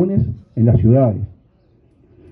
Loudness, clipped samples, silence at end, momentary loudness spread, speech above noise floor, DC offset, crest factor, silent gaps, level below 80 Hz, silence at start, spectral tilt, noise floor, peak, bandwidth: -16 LUFS; under 0.1%; 1.05 s; 14 LU; 40 dB; under 0.1%; 14 dB; none; -38 dBFS; 0 s; -14.5 dB/octave; -54 dBFS; -2 dBFS; 2.6 kHz